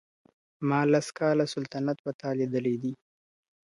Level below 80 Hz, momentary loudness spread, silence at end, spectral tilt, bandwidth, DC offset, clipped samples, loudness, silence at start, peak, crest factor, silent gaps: -76 dBFS; 9 LU; 0.7 s; -6.5 dB/octave; 11.5 kHz; under 0.1%; under 0.1%; -29 LUFS; 0.6 s; -12 dBFS; 18 dB; 1.99-2.04 s, 2.14-2.19 s